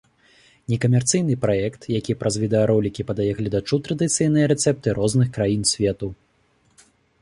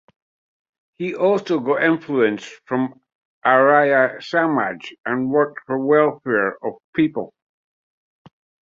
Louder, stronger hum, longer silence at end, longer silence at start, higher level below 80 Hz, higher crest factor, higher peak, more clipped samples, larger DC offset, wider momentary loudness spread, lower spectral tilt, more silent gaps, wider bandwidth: about the same, -21 LUFS vs -19 LUFS; neither; second, 1.1 s vs 1.35 s; second, 0.7 s vs 1 s; first, -48 dBFS vs -66 dBFS; about the same, 16 dB vs 18 dB; second, -6 dBFS vs -2 dBFS; neither; neither; second, 7 LU vs 13 LU; second, -5.5 dB/octave vs -7 dB/octave; second, none vs 3.15-3.41 s, 4.98-5.04 s, 6.84-6.93 s; first, 11.5 kHz vs 7.6 kHz